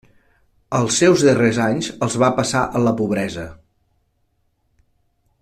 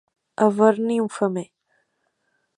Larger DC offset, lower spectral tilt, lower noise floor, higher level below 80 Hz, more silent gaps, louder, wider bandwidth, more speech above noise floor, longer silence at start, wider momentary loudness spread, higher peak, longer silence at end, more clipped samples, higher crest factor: neither; second, -5 dB/octave vs -7 dB/octave; second, -66 dBFS vs -72 dBFS; first, -50 dBFS vs -74 dBFS; neither; first, -18 LUFS vs -21 LUFS; first, 14 kHz vs 11 kHz; about the same, 49 dB vs 52 dB; first, 0.7 s vs 0.4 s; second, 11 LU vs 19 LU; about the same, -2 dBFS vs -4 dBFS; first, 1.9 s vs 1.15 s; neither; about the same, 18 dB vs 20 dB